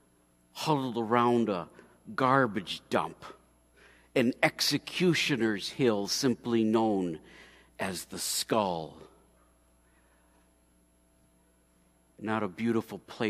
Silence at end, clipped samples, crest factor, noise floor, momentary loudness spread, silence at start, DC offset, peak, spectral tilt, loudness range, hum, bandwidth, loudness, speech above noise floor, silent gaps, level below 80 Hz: 0 s; under 0.1%; 24 dB; -66 dBFS; 14 LU; 0.55 s; under 0.1%; -8 dBFS; -4.5 dB/octave; 10 LU; 60 Hz at -60 dBFS; 15.5 kHz; -29 LUFS; 37 dB; none; -68 dBFS